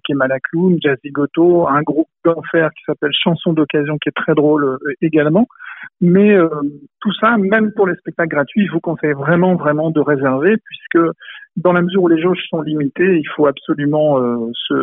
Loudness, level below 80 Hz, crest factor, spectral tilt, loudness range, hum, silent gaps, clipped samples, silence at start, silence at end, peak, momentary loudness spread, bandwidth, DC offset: -15 LUFS; -60 dBFS; 14 dB; -11 dB/octave; 1 LU; none; none; under 0.1%; 0.05 s; 0 s; 0 dBFS; 7 LU; 3.9 kHz; under 0.1%